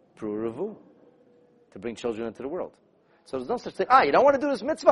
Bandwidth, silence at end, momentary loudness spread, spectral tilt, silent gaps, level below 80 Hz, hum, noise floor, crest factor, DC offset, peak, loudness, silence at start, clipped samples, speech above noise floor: 11 kHz; 0 s; 17 LU; -5 dB/octave; none; -64 dBFS; none; -59 dBFS; 22 dB; under 0.1%; -4 dBFS; -25 LUFS; 0.2 s; under 0.1%; 35 dB